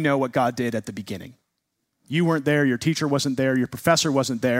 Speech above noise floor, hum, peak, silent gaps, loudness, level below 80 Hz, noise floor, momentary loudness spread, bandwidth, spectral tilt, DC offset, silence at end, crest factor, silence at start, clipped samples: 55 dB; none; -4 dBFS; none; -22 LUFS; -62 dBFS; -77 dBFS; 12 LU; 16 kHz; -5 dB/octave; under 0.1%; 0 s; 20 dB; 0 s; under 0.1%